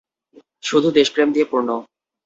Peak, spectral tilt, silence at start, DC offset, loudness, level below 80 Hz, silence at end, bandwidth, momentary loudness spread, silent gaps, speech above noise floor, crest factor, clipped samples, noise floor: -2 dBFS; -4.5 dB/octave; 0.65 s; under 0.1%; -18 LUFS; -64 dBFS; 0.4 s; 8 kHz; 11 LU; none; 35 dB; 18 dB; under 0.1%; -52 dBFS